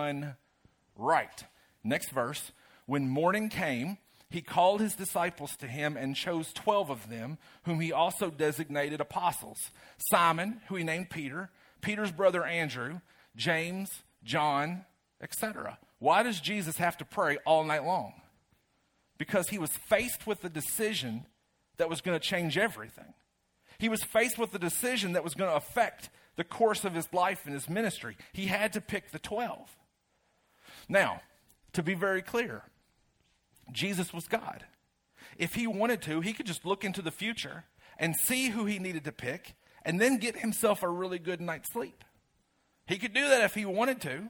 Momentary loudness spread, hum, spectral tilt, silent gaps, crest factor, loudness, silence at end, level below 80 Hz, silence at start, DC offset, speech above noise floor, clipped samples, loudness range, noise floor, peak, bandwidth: 14 LU; none; -4 dB/octave; none; 22 dB; -32 LUFS; 0 s; -68 dBFS; 0 s; under 0.1%; 43 dB; under 0.1%; 4 LU; -74 dBFS; -10 dBFS; 19.5 kHz